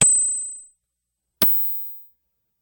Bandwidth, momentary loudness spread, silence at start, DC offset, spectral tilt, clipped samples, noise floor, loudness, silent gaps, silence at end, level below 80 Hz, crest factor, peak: 17 kHz; 21 LU; 0 s; under 0.1%; -1 dB/octave; under 0.1%; -80 dBFS; -18 LUFS; none; 0.6 s; -62 dBFS; 20 dB; -2 dBFS